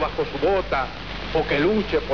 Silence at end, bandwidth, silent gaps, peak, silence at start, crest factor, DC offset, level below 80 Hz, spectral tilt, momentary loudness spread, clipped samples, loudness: 0 s; 5.4 kHz; none; -10 dBFS; 0 s; 14 dB; 0.8%; -38 dBFS; -6.5 dB/octave; 7 LU; under 0.1%; -23 LUFS